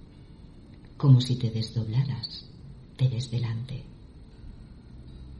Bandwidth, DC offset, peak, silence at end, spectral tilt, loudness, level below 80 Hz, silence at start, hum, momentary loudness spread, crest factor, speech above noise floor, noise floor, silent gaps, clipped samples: 11 kHz; under 0.1%; -8 dBFS; 0 s; -7.5 dB/octave; -27 LUFS; -50 dBFS; 0.15 s; none; 27 LU; 20 dB; 23 dB; -48 dBFS; none; under 0.1%